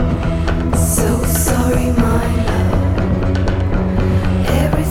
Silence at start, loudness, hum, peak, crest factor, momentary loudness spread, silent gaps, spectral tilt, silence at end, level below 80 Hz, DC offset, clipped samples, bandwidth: 0 s; -16 LUFS; none; -2 dBFS; 14 dB; 3 LU; none; -6 dB/octave; 0 s; -20 dBFS; under 0.1%; under 0.1%; 16.5 kHz